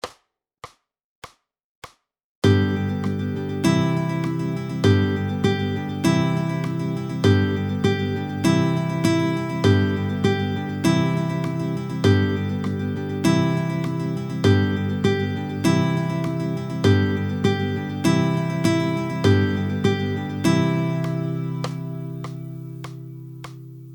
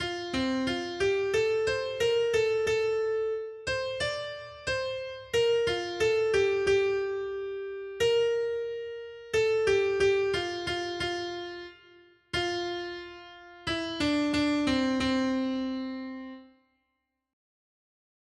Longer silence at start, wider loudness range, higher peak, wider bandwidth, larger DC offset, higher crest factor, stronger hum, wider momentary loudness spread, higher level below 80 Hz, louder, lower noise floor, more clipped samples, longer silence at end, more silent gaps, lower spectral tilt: about the same, 0.05 s vs 0 s; about the same, 3 LU vs 5 LU; first, -4 dBFS vs -14 dBFS; first, 19.5 kHz vs 12.5 kHz; neither; about the same, 18 dB vs 14 dB; neither; second, 9 LU vs 13 LU; about the same, -54 dBFS vs -56 dBFS; first, -22 LUFS vs -29 LUFS; second, -65 dBFS vs -81 dBFS; neither; second, 0 s vs 1.85 s; first, 1.04-1.22 s, 1.64-1.82 s, 2.24-2.42 s vs none; first, -6.5 dB/octave vs -4 dB/octave